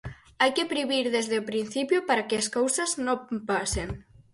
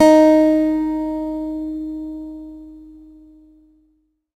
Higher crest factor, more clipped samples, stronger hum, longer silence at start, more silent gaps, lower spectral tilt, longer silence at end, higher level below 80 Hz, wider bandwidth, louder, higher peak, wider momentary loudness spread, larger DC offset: about the same, 18 dB vs 18 dB; neither; neither; about the same, 0.05 s vs 0 s; neither; second, -3 dB/octave vs -5 dB/octave; second, 0.3 s vs 1.45 s; about the same, -48 dBFS vs -48 dBFS; about the same, 11.5 kHz vs 12.5 kHz; second, -27 LUFS vs -17 LUFS; second, -10 dBFS vs 0 dBFS; second, 6 LU vs 24 LU; neither